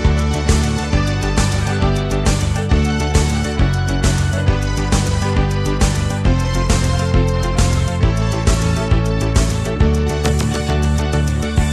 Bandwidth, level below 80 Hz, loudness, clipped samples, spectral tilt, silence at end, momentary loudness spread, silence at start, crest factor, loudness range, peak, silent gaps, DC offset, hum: 13.5 kHz; -20 dBFS; -17 LUFS; under 0.1%; -5.5 dB/octave; 0 s; 2 LU; 0 s; 14 dB; 0 LU; -2 dBFS; none; under 0.1%; none